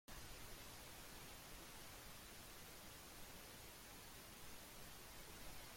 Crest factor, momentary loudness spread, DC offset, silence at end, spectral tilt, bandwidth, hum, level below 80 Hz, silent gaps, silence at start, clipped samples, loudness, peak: 14 dB; 1 LU; under 0.1%; 0 s; -2.5 dB/octave; 16.5 kHz; none; -66 dBFS; none; 0.1 s; under 0.1%; -57 LUFS; -42 dBFS